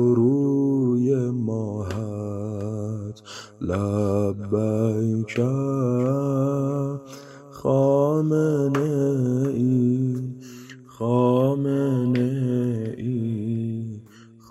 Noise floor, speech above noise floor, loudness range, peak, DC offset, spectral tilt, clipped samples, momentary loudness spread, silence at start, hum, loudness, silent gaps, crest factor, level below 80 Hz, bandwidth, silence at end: -48 dBFS; 26 dB; 4 LU; -8 dBFS; under 0.1%; -9 dB/octave; under 0.1%; 14 LU; 0 s; none; -23 LUFS; none; 16 dB; -62 dBFS; 12.5 kHz; 0.25 s